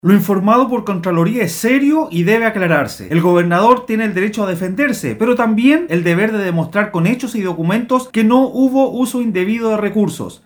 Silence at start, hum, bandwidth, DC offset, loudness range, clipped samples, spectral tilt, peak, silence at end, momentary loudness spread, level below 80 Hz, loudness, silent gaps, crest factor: 0.05 s; none; over 20 kHz; under 0.1%; 1 LU; under 0.1%; -6.5 dB/octave; 0 dBFS; 0.1 s; 5 LU; -54 dBFS; -15 LUFS; none; 14 dB